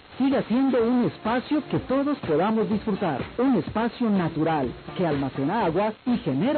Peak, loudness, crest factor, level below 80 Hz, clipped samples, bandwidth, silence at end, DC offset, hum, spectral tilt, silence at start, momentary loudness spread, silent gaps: -14 dBFS; -25 LUFS; 10 dB; -52 dBFS; under 0.1%; 4.5 kHz; 0 s; under 0.1%; none; -11.5 dB/octave; 0.1 s; 4 LU; none